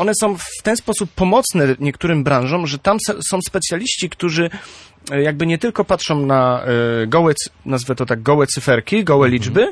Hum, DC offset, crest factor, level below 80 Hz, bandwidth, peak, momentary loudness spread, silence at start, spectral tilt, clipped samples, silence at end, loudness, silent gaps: none; under 0.1%; 16 dB; -46 dBFS; 11 kHz; -2 dBFS; 6 LU; 0 s; -5 dB/octave; under 0.1%; 0 s; -17 LUFS; none